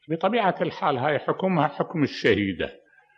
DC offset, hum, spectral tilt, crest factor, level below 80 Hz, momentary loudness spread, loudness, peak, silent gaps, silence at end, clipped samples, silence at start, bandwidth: under 0.1%; none; -7 dB/octave; 18 dB; -58 dBFS; 5 LU; -24 LUFS; -6 dBFS; none; 0.4 s; under 0.1%; 0.1 s; 7.8 kHz